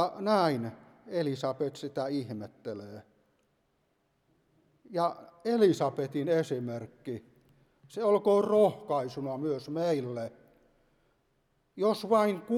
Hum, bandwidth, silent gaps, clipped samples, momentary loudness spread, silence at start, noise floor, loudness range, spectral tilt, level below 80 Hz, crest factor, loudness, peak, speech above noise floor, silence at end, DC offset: none; 13.5 kHz; none; under 0.1%; 16 LU; 0 s; -74 dBFS; 9 LU; -6.5 dB/octave; -76 dBFS; 20 dB; -30 LUFS; -12 dBFS; 45 dB; 0 s; under 0.1%